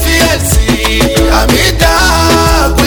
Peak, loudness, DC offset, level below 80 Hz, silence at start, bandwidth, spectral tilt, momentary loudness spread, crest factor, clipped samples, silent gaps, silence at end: 0 dBFS; -8 LUFS; under 0.1%; -14 dBFS; 0 s; over 20 kHz; -4 dB/octave; 2 LU; 8 dB; 0.2%; none; 0 s